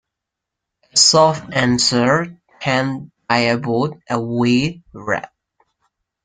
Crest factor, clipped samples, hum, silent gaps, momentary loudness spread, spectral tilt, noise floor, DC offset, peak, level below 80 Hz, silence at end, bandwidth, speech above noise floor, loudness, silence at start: 18 dB; under 0.1%; none; none; 13 LU; -3.5 dB/octave; -82 dBFS; under 0.1%; 0 dBFS; -54 dBFS; 1 s; 9.6 kHz; 65 dB; -17 LUFS; 0.95 s